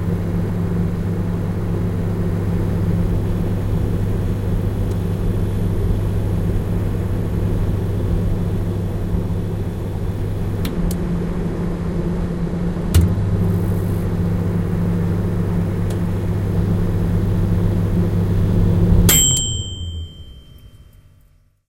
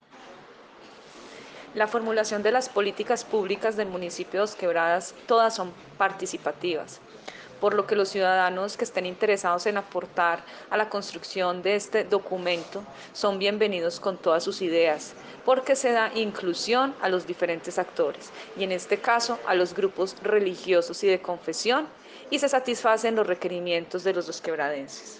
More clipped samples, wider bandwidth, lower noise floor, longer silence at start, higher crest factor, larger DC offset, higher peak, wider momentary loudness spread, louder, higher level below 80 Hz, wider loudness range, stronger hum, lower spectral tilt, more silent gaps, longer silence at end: neither; first, 17 kHz vs 9.8 kHz; first, -53 dBFS vs -49 dBFS; second, 0 s vs 0.15 s; about the same, 18 dB vs 18 dB; neither; first, 0 dBFS vs -8 dBFS; second, 6 LU vs 10 LU; first, -20 LUFS vs -26 LUFS; first, -26 dBFS vs -72 dBFS; first, 6 LU vs 2 LU; neither; first, -5.5 dB/octave vs -3.5 dB/octave; neither; first, 0.9 s vs 0 s